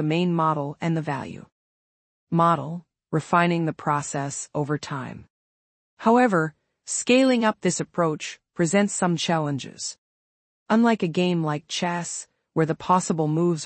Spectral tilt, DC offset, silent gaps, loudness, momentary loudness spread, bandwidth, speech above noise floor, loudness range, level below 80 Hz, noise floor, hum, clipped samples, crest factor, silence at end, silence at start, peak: -5 dB/octave; under 0.1%; 1.52-2.27 s, 5.30-5.97 s, 9.98-10.66 s; -24 LUFS; 13 LU; 8.8 kHz; over 67 dB; 3 LU; -66 dBFS; under -90 dBFS; none; under 0.1%; 18 dB; 0 s; 0 s; -6 dBFS